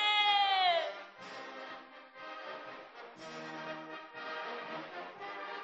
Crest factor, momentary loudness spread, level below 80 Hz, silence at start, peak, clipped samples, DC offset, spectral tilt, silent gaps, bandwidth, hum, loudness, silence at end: 20 dB; 21 LU; under -90 dBFS; 0 s; -18 dBFS; under 0.1%; under 0.1%; 2 dB/octave; none; 8 kHz; none; -35 LUFS; 0 s